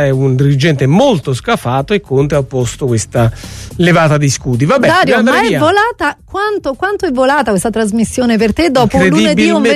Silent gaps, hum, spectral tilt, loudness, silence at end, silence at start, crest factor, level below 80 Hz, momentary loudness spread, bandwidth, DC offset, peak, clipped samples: none; none; -5.5 dB/octave; -11 LUFS; 0 s; 0 s; 10 dB; -34 dBFS; 7 LU; 13.5 kHz; under 0.1%; 0 dBFS; under 0.1%